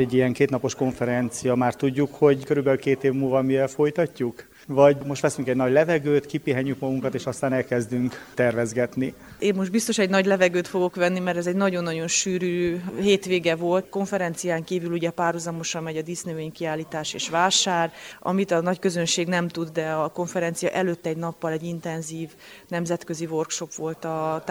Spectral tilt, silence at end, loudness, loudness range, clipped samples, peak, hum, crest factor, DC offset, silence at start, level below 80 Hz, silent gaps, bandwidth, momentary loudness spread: -4.5 dB/octave; 0 s; -24 LUFS; 5 LU; under 0.1%; -4 dBFS; none; 20 dB; under 0.1%; 0 s; -60 dBFS; none; 20 kHz; 10 LU